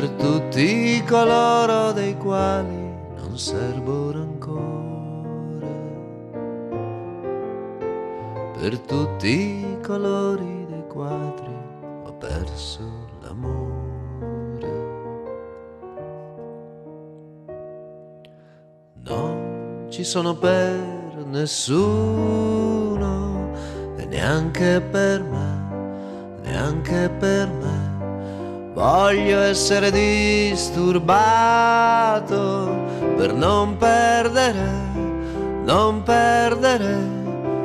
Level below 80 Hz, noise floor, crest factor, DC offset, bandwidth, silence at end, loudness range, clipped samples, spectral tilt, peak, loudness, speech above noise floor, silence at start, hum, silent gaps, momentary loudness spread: -40 dBFS; -50 dBFS; 14 dB; under 0.1%; 14 kHz; 0 s; 14 LU; under 0.1%; -5.5 dB/octave; -6 dBFS; -21 LUFS; 31 dB; 0 s; none; none; 18 LU